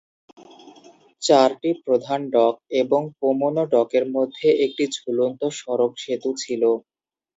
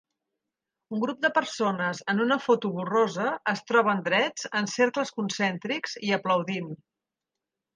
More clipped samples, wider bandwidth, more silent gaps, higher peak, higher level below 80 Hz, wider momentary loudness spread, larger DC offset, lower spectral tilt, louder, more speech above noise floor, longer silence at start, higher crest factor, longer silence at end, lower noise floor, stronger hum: neither; second, 8 kHz vs 9.8 kHz; neither; first, -2 dBFS vs -8 dBFS; about the same, -74 dBFS vs -78 dBFS; about the same, 8 LU vs 7 LU; neither; about the same, -4.5 dB/octave vs -4.5 dB/octave; first, -21 LUFS vs -26 LUFS; second, 30 dB vs 61 dB; second, 0.65 s vs 0.9 s; about the same, 20 dB vs 18 dB; second, 0.6 s vs 1 s; second, -51 dBFS vs -87 dBFS; neither